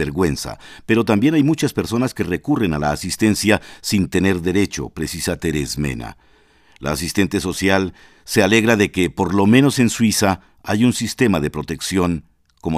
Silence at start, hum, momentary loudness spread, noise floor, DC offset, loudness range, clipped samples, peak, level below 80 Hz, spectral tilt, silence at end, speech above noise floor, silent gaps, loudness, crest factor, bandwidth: 0 s; none; 11 LU; -53 dBFS; under 0.1%; 6 LU; under 0.1%; 0 dBFS; -40 dBFS; -5 dB/octave; 0 s; 35 dB; none; -18 LUFS; 18 dB; 16 kHz